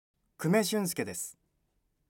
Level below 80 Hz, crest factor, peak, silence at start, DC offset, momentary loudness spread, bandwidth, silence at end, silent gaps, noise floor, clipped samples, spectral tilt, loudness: -74 dBFS; 20 dB; -14 dBFS; 0.4 s; under 0.1%; 11 LU; 17 kHz; 0.85 s; none; -76 dBFS; under 0.1%; -4.5 dB/octave; -31 LUFS